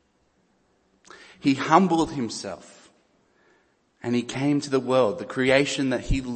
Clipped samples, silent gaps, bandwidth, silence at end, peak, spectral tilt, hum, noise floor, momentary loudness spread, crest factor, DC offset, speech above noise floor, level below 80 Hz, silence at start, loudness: under 0.1%; none; 8.8 kHz; 0 s; -2 dBFS; -5.5 dB/octave; none; -66 dBFS; 13 LU; 22 dB; under 0.1%; 44 dB; -42 dBFS; 1.15 s; -23 LUFS